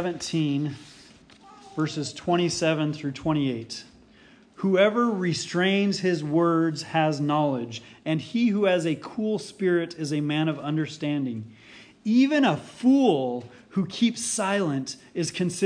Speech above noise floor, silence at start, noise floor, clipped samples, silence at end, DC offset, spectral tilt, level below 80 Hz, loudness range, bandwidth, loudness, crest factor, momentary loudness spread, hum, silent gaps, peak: 30 dB; 0 s; -54 dBFS; under 0.1%; 0 s; under 0.1%; -5.5 dB/octave; -64 dBFS; 4 LU; 10.5 kHz; -25 LUFS; 18 dB; 11 LU; none; none; -8 dBFS